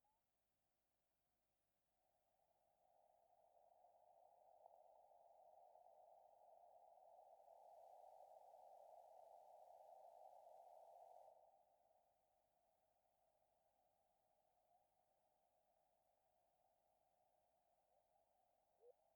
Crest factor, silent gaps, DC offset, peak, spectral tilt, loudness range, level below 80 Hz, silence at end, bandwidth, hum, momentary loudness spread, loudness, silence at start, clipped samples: 20 dB; none; under 0.1%; -52 dBFS; -3 dB/octave; 3 LU; under -90 dBFS; 0 s; over 20 kHz; none; 3 LU; -67 LUFS; 0 s; under 0.1%